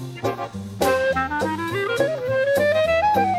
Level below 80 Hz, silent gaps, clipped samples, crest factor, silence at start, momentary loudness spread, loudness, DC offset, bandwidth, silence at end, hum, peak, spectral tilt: -48 dBFS; none; under 0.1%; 14 dB; 0 s; 9 LU; -21 LUFS; under 0.1%; 16 kHz; 0 s; none; -8 dBFS; -5 dB/octave